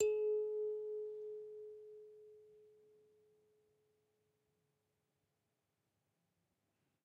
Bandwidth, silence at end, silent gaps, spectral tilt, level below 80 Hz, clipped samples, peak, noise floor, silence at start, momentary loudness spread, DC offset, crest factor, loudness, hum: 7.8 kHz; 4.35 s; none; -4 dB/octave; -88 dBFS; under 0.1%; -24 dBFS; -87 dBFS; 0 s; 23 LU; under 0.1%; 22 dB; -42 LUFS; none